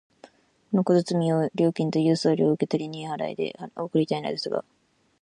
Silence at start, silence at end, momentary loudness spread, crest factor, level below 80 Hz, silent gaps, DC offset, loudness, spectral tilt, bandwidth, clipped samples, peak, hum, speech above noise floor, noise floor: 0.25 s; 0.6 s; 10 LU; 18 dB; -70 dBFS; none; under 0.1%; -25 LUFS; -7 dB/octave; 10.5 kHz; under 0.1%; -8 dBFS; none; 30 dB; -54 dBFS